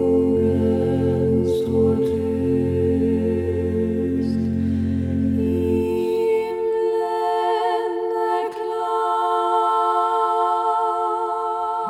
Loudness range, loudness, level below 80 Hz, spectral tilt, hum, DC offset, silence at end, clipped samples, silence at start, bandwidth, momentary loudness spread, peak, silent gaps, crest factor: 2 LU; -21 LUFS; -44 dBFS; -8 dB/octave; none; under 0.1%; 0 s; under 0.1%; 0 s; 13 kHz; 4 LU; -8 dBFS; none; 12 dB